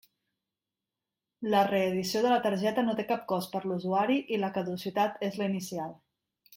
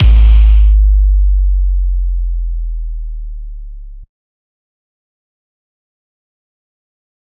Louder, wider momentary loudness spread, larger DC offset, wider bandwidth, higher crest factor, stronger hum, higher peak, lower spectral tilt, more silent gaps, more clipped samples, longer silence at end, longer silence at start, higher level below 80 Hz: second, -30 LUFS vs -13 LUFS; second, 8 LU vs 21 LU; neither; first, 16.5 kHz vs 3.5 kHz; first, 18 dB vs 12 dB; neither; second, -12 dBFS vs 0 dBFS; second, -5.5 dB/octave vs -9.5 dB/octave; neither; neither; second, 0.65 s vs 3.35 s; first, 1.4 s vs 0 s; second, -74 dBFS vs -12 dBFS